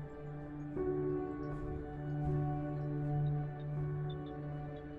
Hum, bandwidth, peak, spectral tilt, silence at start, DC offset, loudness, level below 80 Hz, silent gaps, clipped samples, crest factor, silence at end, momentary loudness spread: none; 4 kHz; -24 dBFS; -10.5 dB/octave; 0 s; under 0.1%; -39 LUFS; -52 dBFS; none; under 0.1%; 14 dB; 0 s; 8 LU